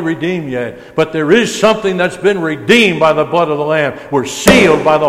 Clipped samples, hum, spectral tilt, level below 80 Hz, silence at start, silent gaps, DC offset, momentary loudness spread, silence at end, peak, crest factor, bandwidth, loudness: 0.1%; none; -4.5 dB/octave; -40 dBFS; 0 s; none; under 0.1%; 10 LU; 0 s; 0 dBFS; 12 dB; 17 kHz; -12 LUFS